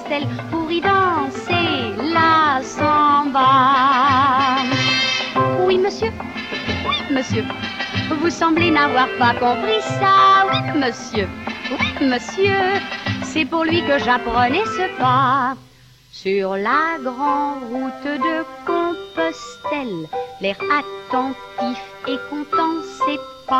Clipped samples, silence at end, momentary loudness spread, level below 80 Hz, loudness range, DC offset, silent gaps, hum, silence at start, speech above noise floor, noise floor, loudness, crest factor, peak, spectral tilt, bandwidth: under 0.1%; 0 s; 11 LU; -50 dBFS; 8 LU; under 0.1%; none; none; 0 s; 28 dB; -47 dBFS; -18 LUFS; 14 dB; -4 dBFS; -5 dB/octave; 12.5 kHz